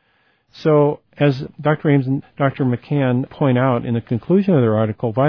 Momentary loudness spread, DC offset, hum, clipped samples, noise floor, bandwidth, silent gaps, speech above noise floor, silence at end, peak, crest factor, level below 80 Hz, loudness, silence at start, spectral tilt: 6 LU; under 0.1%; none; under 0.1%; -61 dBFS; 5.4 kHz; none; 44 dB; 0 s; -4 dBFS; 14 dB; -56 dBFS; -18 LUFS; 0.55 s; -10 dB/octave